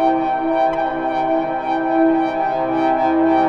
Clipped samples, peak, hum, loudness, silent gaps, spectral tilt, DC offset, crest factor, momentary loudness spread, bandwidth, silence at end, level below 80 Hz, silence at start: under 0.1%; -6 dBFS; none; -18 LUFS; none; -7.5 dB/octave; under 0.1%; 12 dB; 4 LU; 6 kHz; 0 s; -48 dBFS; 0 s